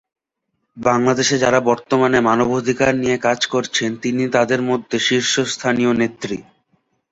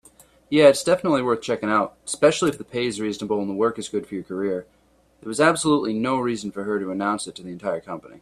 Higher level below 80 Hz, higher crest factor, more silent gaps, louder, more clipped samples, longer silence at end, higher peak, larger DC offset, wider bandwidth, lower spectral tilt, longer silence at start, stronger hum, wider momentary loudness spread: first, -54 dBFS vs -60 dBFS; about the same, 18 dB vs 20 dB; neither; first, -17 LUFS vs -22 LUFS; neither; first, 0.7 s vs 0.05 s; about the same, 0 dBFS vs -2 dBFS; neither; second, 8 kHz vs 14 kHz; about the same, -4 dB/octave vs -4.5 dB/octave; first, 0.75 s vs 0.5 s; neither; second, 6 LU vs 13 LU